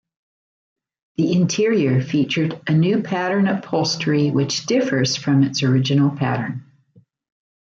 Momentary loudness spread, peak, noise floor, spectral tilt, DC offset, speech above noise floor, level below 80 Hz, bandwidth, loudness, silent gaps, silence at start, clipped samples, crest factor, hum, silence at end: 5 LU; -6 dBFS; -55 dBFS; -5.5 dB/octave; under 0.1%; 37 dB; -62 dBFS; 7.8 kHz; -19 LUFS; none; 1.2 s; under 0.1%; 14 dB; none; 1 s